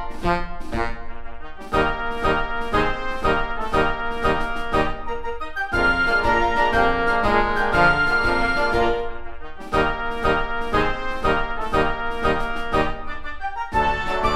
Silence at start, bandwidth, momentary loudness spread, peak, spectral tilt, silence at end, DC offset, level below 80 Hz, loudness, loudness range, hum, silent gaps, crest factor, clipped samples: 0 s; 11 kHz; 11 LU; -4 dBFS; -5.5 dB/octave; 0 s; under 0.1%; -30 dBFS; -22 LUFS; 5 LU; none; none; 18 dB; under 0.1%